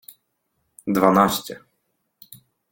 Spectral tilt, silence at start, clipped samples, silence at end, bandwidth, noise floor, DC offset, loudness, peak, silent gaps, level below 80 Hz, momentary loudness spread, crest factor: -5 dB/octave; 0.85 s; under 0.1%; 1.15 s; 17 kHz; -73 dBFS; under 0.1%; -19 LUFS; 0 dBFS; none; -58 dBFS; 21 LU; 24 dB